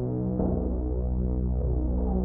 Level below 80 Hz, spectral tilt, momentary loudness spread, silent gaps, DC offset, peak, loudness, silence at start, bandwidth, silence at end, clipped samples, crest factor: -28 dBFS; -12.5 dB/octave; 2 LU; none; under 0.1%; -14 dBFS; -29 LUFS; 0 s; 1.6 kHz; 0 s; under 0.1%; 12 dB